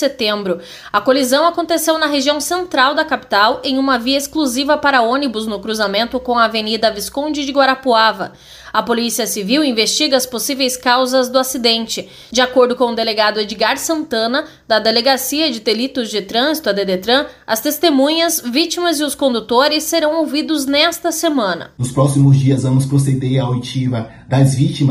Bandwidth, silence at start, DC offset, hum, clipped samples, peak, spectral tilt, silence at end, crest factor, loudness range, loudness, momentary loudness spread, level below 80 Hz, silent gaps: 15.5 kHz; 0 s; under 0.1%; none; under 0.1%; 0 dBFS; -4.5 dB/octave; 0 s; 14 dB; 1 LU; -15 LUFS; 7 LU; -50 dBFS; none